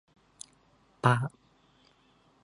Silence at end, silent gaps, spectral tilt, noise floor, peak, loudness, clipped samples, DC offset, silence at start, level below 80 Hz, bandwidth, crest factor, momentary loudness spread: 1.15 s; none; -6 dB/octave; -65 dBFS; -6 dBFS; -29 LUFS; under 0.1%; under 0.1%; 1.05 s; -72 dBFS; 11.5 kHz; 28 dB; 23 LU